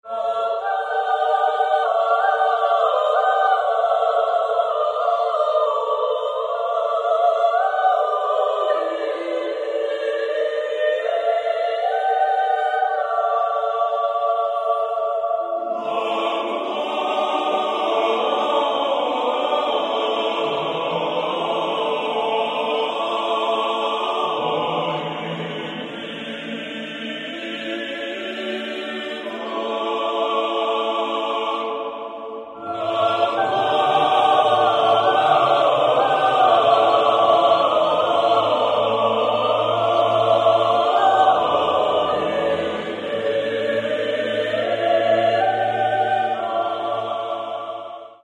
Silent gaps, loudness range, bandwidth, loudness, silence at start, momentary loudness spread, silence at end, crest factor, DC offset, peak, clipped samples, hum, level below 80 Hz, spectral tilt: none; 7 LU; 9.8 kHz; -20 LUFS; 0.05 s; 11 LU; 0.1 s; 16 dB; under 0.1%; -4 dBFS; under 0.1%; none; -66 dBFS; -4.5 dB/octave